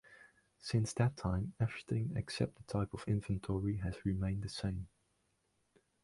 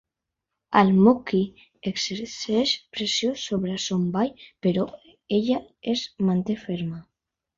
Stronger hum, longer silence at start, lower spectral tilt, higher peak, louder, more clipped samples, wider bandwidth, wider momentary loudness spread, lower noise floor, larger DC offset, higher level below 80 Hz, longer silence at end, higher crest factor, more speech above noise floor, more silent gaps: neither; second, 0.1 s vs 0.7 s; about the same, -6.5 dB/octave vs -5.5 dB/octave; second, -20 dBFS vs -2 dBFS; second, -38 LUFS vs -24 LUFS; neither; first, 11.5 kHz vs 7.6 kHz; second, 5 LU vs 12 LU; second, -79 dBFS vs -84 dBFS; neither; first, -54 dBFS vs -60 dBFS; first, 1.15 s vs 0.55 s; about the same, 18 dB vs 22 dB; second, 42 dB vs 61 dB; neither